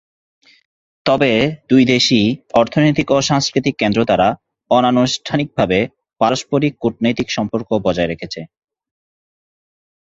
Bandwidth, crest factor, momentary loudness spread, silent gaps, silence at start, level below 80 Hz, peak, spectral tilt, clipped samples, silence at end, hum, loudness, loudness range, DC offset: 7.8 kHz; 16 dB; 7 LU; none; 1.05 s; -48 dBFS; 0 dBFS; -5 dB/octave; under 0.1%; 1.65 s; none; -16 LUFS; 6 LU; under 0.1%